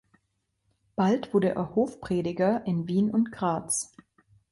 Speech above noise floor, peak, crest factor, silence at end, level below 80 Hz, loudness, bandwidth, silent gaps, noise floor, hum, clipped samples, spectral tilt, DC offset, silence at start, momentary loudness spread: 50 dB; -12 dBFS; 16 dB; 0.65 s; -62 dBFS; -27 LUFS; 11.5 kHz; none; -77 dBFS; none; under 0.1%; -6 dB/octave; under 0.1%; 1 s; 5 LU